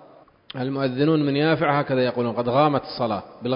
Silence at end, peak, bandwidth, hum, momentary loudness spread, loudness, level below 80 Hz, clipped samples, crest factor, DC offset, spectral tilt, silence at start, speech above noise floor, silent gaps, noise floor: 0 s; -6 dBFS; 5.4 kHz; none; 9 LU; -22 LUFS; -58 dBFS; under 0.1%; 18 dB; under 0.1%; -11.5 dB/octave; 0.55 s; 29 dB; none; -51 dBFS